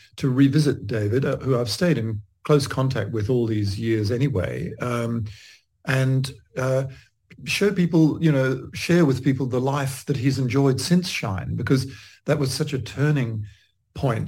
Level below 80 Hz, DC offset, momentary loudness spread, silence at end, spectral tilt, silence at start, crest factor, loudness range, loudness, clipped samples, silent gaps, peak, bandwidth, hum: -52 dBFS; under 0.1%; 10 LU; 0 s; -6.5 dB/octave; 0.15 s; 16 dB; 4 LU; -23 LUFS; under 0.1%; none; -6 dBFS; 16.5 kHz; none